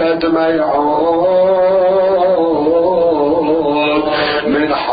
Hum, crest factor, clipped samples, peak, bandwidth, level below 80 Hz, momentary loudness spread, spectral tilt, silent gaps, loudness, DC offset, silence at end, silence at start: none; 10 dB; under 0.1%; -2 dBFS; 5 kHz; -46 dBFS; 3 LU; -10.5 dB/octave; none; -13 LUFS; under 0.1%; 0 s; 0 s